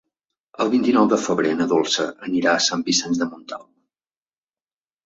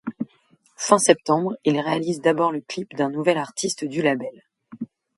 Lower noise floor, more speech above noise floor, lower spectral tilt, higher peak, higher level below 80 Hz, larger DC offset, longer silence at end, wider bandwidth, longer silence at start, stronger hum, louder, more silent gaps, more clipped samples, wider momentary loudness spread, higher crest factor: first, under -90 dBFS vs -60 dBFS; first, over 70 dB vs 39 dB; about the same, -3 dB/octave vs -4 dB/octave; second, -4 dBFS vs 0 dBFS; first, -64 dBFS vs -70 dBFS; neither; first, 1.45 s vs 0.35 s; second, 8 kHz vs 11.5 kHz; first, 0.6 s vs 0.05 s; neither; about the same, -20 LUFS vs -22 LUFS; neither; neither; second, 10 LU vs 17 LU; about the same, 18 dB vs 22 dB